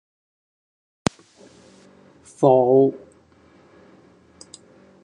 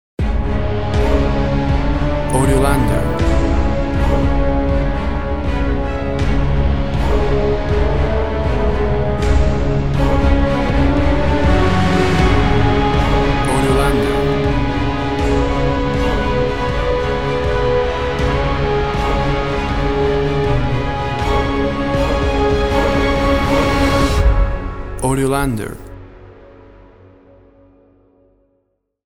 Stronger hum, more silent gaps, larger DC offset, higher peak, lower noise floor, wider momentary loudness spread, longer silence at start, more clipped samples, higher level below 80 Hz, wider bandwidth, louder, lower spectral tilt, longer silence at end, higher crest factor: neither; neither; second, under 0.1% vs 4%; about the same, 0 dBFS vs 0 dBFS; second, -54 dBFS vs -66 dBFS; first, 13 LU vs 5 LU; first, 2.4 s vs 0.15 s; neither; second, -60 dBFS vs -20 dBFS; second, 10.5 kHz vs 13.5 kHz; about the same, -19 LUFS vs -17 LUFS; about the same, -6.5 dB/octave vs -6.5 dB/octave; first, 2.05 s vs 0 s; first, 24 dB vs 16 dB